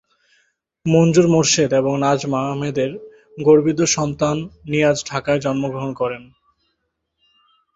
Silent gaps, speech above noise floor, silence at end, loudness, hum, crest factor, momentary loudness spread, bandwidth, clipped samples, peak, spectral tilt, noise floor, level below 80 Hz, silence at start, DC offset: none; 56 dB; 1.5 s; -18 LUFS; none; 18 dB; 11 LU; 8 kHz; under 0.1%; -2 dBFS; -5 dB/octave; -73 dBFS; -52 dBFS; 0.85 s; under 0.1%